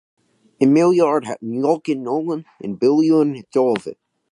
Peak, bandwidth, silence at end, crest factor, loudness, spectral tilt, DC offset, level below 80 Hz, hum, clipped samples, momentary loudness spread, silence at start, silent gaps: -2 dBFS; 11 kHz; 0.4 s; 16 dB; -18 LUFS; -7 dB/octave; under 0.1%; -68 dBFS; none; under 0.1%; 12 LU; 0.6 s; none